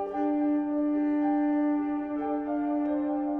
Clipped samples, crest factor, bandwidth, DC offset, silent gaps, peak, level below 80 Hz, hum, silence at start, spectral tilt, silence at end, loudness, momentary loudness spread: under 0.1%; 10 dB; 3.2 kHz; under 0.1%; none; -18 dBFS; -62 dBFS; none; 0 s; -9 dB/octave; 0 s; -28 LUFS; 5 LU